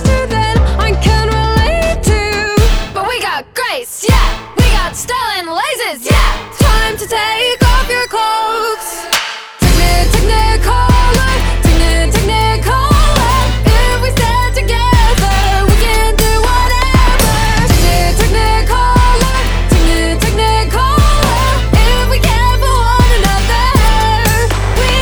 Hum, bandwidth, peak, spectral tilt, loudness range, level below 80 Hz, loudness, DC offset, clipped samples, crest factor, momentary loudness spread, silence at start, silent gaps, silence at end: none; over 20 kHz; 0 dBFS; -4.5 dB/octave; 3 LU; -12 dBFS; -12 LUFS; under 0.1%; under 0.1%; 10 dB; 5 LU; 0 s; none; 0 s